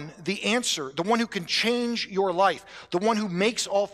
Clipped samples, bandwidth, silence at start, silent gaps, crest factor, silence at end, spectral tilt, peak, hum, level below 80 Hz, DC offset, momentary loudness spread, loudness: under 0.1%; 15 kHz; 0 s; none; 16 dB; 0 s; -3.5 dB/octave; -10 dBFS; none; -66 dBFS; under 0.1%; 5 LU; -25 LUFS